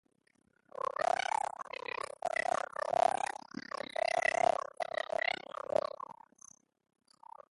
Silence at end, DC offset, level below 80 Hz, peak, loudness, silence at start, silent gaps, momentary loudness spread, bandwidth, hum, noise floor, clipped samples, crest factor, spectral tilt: 1.4 s; under 0.1%; -78 dBFS; -16 dBFS; -35 LUFS; 1 s; none; 13 LU; 11.5 kHz; none; -61 dBFS; under 0.1%; 20 dB; -2 dB/octave